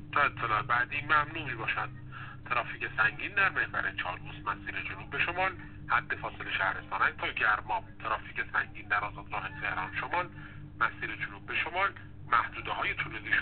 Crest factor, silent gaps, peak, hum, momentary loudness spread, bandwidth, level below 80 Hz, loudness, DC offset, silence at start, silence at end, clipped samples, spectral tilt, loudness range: 22 dB; none; -12 dBFS; none; 10 LU; 4.6 kHz; -54 dBFS; -31 LUFS; 0.2%; 0 s; 0 s; under 0.1%; -1.5 dB/octave; 3 LU